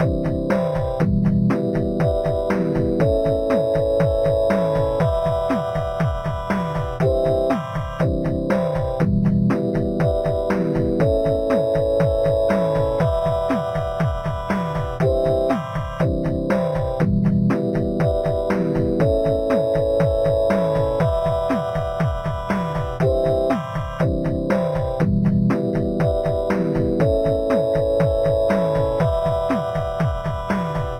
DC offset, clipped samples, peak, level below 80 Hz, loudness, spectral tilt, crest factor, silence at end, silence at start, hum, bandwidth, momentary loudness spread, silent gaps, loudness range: under 0.1%; under 0.1%; -6 dBFS; -32 dBFS; -20 LUFS; -8.5 dB/octave; 14 dB; 0 s; 0 s; none; 14 kHz; 4 LU; none; 2 LU